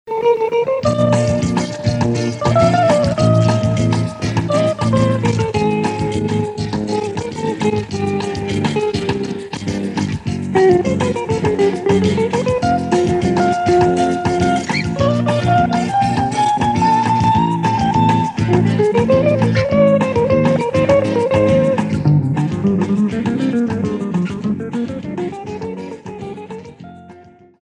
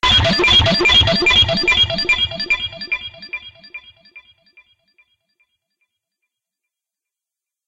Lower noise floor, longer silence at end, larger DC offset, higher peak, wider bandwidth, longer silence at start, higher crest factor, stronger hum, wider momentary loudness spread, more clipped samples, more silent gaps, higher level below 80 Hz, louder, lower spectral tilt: second, -43 dBFS vs -87 dBFS; second, 0.4 s vs 3.5 s; neither; first, 0 dBFS vs -4 dBFS; about the same, 11 kHz vs 12 kHz; about the same, 0.05 s vs 0.05 s; about the same, 16 dB vs 16 dB; neither; second, 9 LU vs 21 LU; neither; neither; about the same, -40 dBFS vs -36 dBFS; second, -16 LUFS vs -13 LUFS; first, -7 dB/octave vs -3.5 dB/octave